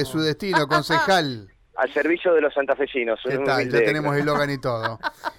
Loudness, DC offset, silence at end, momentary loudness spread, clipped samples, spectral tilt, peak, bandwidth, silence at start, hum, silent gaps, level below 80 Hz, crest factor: -22 LUFS; under 0.1%; 0.05 s; 7 LU; under 0.1%; -5.5 dB/octave; -10 dBFS; 17 kHz; 0 s; none; none; -54 dBFS; 12 dB